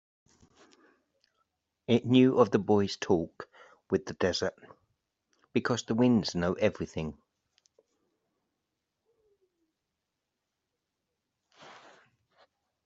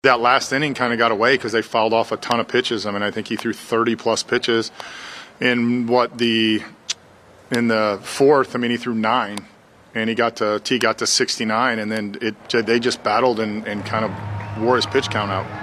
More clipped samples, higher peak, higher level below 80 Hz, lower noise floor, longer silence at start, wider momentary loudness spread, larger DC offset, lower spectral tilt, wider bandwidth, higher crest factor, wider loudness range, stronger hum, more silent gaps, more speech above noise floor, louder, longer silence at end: neither; second, -8 dBFS vs 0 dBFS; second, -66 dBFS vs -58 dBFS; first, -85 dBFS vs -48 dBFS; first, 1.9 s vs 0.05 s; first, 16 LU vs 10 LU; neither; first, -5.5 dB/octave vs -4 dB/octave; second, 7.8 kHz vs 14.5 kHz; about the same, 24 dB vs 20 dB; first, 9 LU vs 2 LU; neither; neither; first, 58 dB vs 28 dB; second, -28 LUFS vs -20 LUFS; first, 1.15 s vs 0 s